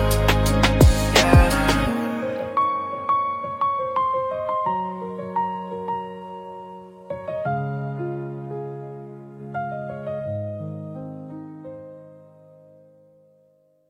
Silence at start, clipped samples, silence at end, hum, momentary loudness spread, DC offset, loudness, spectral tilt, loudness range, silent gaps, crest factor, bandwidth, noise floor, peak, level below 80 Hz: 0 s; under 0.1%; 1.7 s; none; 21 LU; under 0.1%; -23 LUFS; -5.5 dB/octave; 14 LU; none; 22 dB; 16.5 kHz; -60 dBFS; -2 dBFS; -30 dBFS